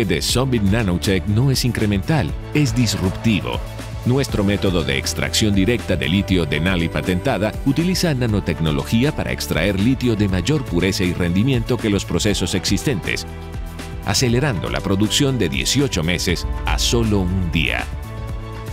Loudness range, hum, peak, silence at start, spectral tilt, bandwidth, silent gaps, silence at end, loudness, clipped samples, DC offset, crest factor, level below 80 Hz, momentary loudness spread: 1 LU; none; -4 dBFS; 0 s; -5 dB/octave; 16 kHz; none; 0 s; -19 LUFS; under 0.1%; under 0.1%; 16 dB; -30 dBFS; 6 LU